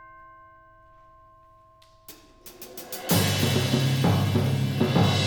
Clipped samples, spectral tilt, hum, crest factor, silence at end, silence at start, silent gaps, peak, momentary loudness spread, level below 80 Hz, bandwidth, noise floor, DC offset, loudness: under 0.1%; -5 dB/octave; none; 18 dB; 0 s; 0 s; none; -8 dBFS; 19 LU; -58 dBFS; over 20 kHz; -55 dBFS; under 0.1%; -24 LUFS